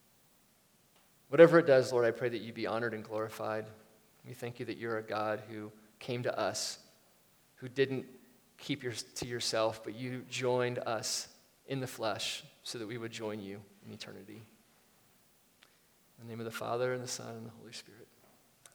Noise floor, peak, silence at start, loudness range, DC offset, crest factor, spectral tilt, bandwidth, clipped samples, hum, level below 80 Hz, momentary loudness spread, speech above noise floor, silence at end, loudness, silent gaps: -68 dBFS; -8 dBFS; 1.3 s; 14 LU; under 0.1%; 28 dB; -4.5 dB/octave; over 20 kHz; under 0.1%; none; -78 dBFS; 18 LU; 34 dB; 0.7 s; -33 LUFS; none